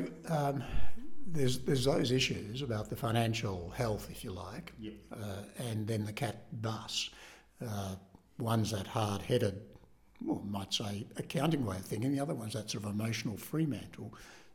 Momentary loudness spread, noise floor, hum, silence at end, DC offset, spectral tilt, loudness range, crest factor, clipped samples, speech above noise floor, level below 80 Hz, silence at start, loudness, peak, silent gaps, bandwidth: 14 LU; -60 dBFS; none; 0 s; under 0.1%; -5.5 dB/octave; 6 LU; 16 dB; under 0.1%; 26 dB; -54 dBFS; 0 s; -36 LUFS; -18 dBFS; none; 17.5 kHz